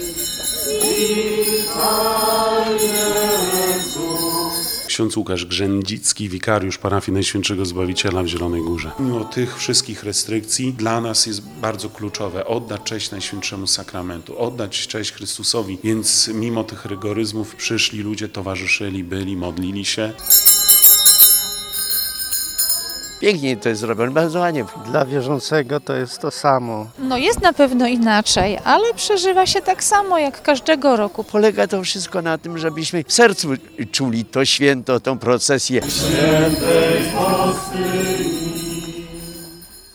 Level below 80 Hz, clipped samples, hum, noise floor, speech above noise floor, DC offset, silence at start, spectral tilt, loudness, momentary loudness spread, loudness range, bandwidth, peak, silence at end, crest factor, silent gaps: -46 dBFS; under 0.1%; none; -39 dBFS; 21 dB; under 0.1%; 0 s; -3 dB/octave; -17 LUFS; 10 LU; 10 LU; over 20 kHz; 0 dBFS; 0.15 s; 18 dB; none